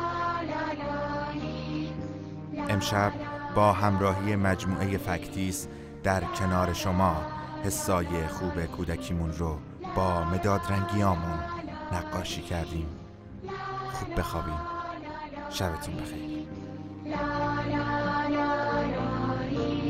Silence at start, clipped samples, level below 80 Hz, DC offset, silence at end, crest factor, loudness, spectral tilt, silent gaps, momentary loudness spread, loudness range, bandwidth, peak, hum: 0 s; under 0.1%; -44 dBFS; under 0.1%; 0 s; 20 dB; -30 LUFS; -5.5 dB/octave; none; 11 LU; 7 LU; 16 kHz; -10 dBFS; none